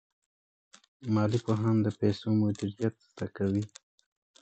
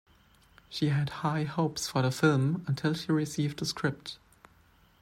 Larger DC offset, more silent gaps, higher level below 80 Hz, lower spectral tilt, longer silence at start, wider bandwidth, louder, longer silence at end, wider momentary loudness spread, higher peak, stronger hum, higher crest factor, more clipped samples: neither; neither; first, -58 dBFS vs -64 dBFS; first, -8 dB/octave vs -5.5 dB/octave; first, 1 s vs 0.7 s; second, 8.4 kHz vs 15 kHz; about the same, -30 LUFS vs -30 LUFS; about the same, 0.75 s vs 0.85 s; first, 13 LU vs 10 LU; second, -14 dBFS vs -10 dBFS; neither; about the same, 18 dB vs 20 dB; neither